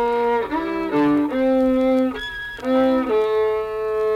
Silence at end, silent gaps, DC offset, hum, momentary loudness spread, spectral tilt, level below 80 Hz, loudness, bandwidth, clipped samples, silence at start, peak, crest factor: 0 s; none; under 0.1%; none; 6 LU; -6.5 dB/octave; -46 dBFS; -20 LUFS; 13 kHz; under 0.1%; 0 s; -8 dBFS; 10 dB